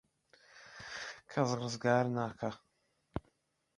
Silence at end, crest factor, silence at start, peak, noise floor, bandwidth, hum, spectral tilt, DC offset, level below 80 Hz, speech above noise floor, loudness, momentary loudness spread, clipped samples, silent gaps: 0.55 s; 22 dB; 0.55 s; -16 dBFS; -78 dBFS; 11 kHz; none; -5.5 dB/octave; under 0.1%; -64 dBFS; 44 dB; -36 LUFS; 20 LU; under 0.1%; none